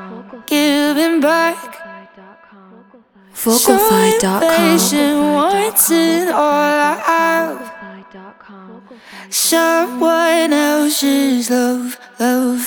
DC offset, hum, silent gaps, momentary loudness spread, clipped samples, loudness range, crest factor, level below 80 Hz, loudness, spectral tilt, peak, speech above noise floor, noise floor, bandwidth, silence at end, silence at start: under 0.1%; none; none; 16 LU; under 0.1%; 5 LU; 16 dB; -56 dBFS; -14 LUFS; -3 dB/octave; 0 dBFS; 33 dB; -47 dBFS; over 20 kHz; 0 s; 0 s